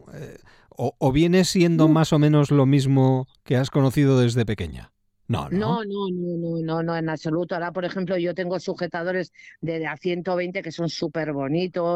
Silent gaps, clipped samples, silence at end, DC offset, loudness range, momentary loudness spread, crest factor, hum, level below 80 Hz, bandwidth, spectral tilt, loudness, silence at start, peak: none; under 0.1%; 0 s; under 0.1%; 8 LU; 11 LU; 18 dB; none; -50 dBFS; 14.5 kHz; -7 dB/octave; -23 LUFS; 0.05 s; -6 dBFS